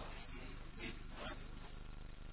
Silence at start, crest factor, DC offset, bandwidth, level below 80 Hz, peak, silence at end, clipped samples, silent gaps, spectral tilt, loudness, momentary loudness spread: 0 s; 14 dB; under 0.1%; 4 kHz; -52 dBFS; -34 dBFS; 0 s; under 0.1%; none; -3.5 dB/octave; -52 LUFS; 6 LU